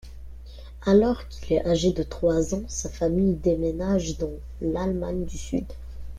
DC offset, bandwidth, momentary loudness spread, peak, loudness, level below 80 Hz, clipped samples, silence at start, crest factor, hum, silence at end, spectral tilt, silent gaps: under 0.1%; 13.5 kHz; 19 LU; -8 dBFS; -25 LUFS; -38 dBFS; under 0.1%; 0.05 s; 18 dB; none; 0 s; -6.5 dB/octave; none